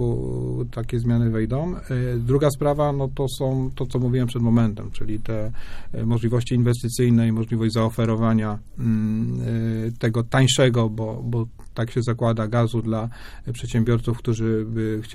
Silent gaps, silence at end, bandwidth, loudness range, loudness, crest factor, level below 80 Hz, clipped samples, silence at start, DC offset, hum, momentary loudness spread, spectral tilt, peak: none; 0 s; 13.5 kHz; 3 LU; -23 LUFS; 16 dB; -38 dBFS; under 0.1%; 0 s; under 0.1%; none; 10 LU; -6.5 dB/octave; -6 dBFS